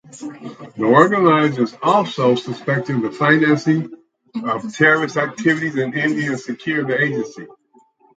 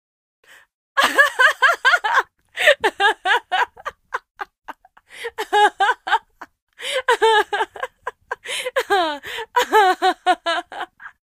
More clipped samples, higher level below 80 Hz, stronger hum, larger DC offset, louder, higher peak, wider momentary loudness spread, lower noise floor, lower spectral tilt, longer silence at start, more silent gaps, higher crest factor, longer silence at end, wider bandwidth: neither; about the same, -66 dBFS vs -62 dBFS; neither; neither; about the same, -17 LUFS vs -18 LUFS; about the same, 0 dBFS vs 0 dBFS; about the same, 17 LU vs 18 LU; first, -55 dBFS vs -45 dBFS; first, -6 dB/octave vs 0 dB/octave; second, 0.15 s vs 0.95 s; second, none vs 4.30-4.35 s, 4.58-4.62 s, 6.62-6.67 s; about the same, 18 dB vs 20 dB; first, 0.7 s vs 0.2 s; second, 9 kHz vs 15.5 kHz